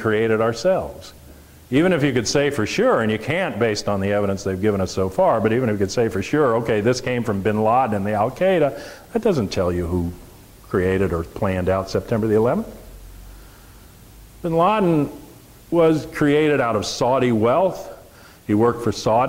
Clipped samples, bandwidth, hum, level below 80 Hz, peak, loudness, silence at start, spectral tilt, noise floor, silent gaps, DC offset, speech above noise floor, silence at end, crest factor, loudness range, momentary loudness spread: under 0.1%; 16 kHz; none; -44 dBFS; -6 dBFS; -20 LUFS; 0 s; -6 dB/octave; -45 dBFS; none; under 0.1%; 26 dB; 0 s; 14 dB; 3 LU; 7 LU